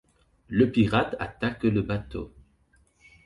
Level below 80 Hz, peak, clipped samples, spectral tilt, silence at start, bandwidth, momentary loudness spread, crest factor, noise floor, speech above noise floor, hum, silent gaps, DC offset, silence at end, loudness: -48 dBFS; -8 dBFS; under 0.1%; -8 dB/octave; 0.5 s; 11 kHz; 16 LU; 18 dB; -64 dBFS; 39 dB; none; none; under 0.1%; 1 s; -26 LUFS